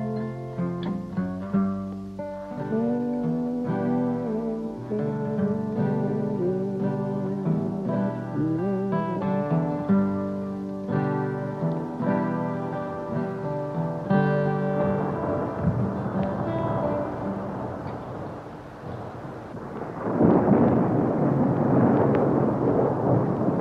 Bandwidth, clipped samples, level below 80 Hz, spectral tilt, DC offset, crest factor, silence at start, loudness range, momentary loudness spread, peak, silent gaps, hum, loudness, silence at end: 6.8 kHz; under 0.1%; -54 dBFS; -10 dB/octave; under 0.1%; 18 dB; 0 s; 7 LU; 13 LU; -6 dBFS; none; none; -26 LUFS; 0 s